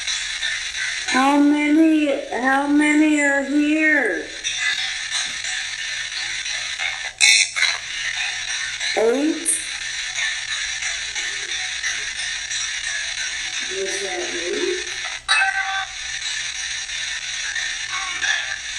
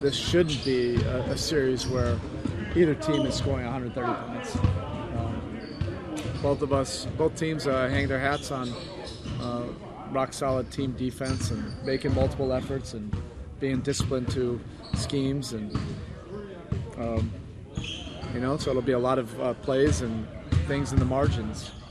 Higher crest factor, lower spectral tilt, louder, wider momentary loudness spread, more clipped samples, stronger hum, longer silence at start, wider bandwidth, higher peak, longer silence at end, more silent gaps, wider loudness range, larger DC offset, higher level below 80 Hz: about the same, 22 dB vs 18 dB; second, -0.5 dB/octave vs -6 dB/octave; first, -20 LUFS vs -28 LUFS; second, 8 LU vs 11 LU; neither; neither; about the same, 0 s vs 0 s; about the same, 12.5 kHz vs 13 kHz; first, 0 dBFS vs -10 dBFS; about the same, 0 s vs 0 s; neither; about the same, 6 LU vs 5 LU; neither; second, -54 dBFS vs -40 dBFS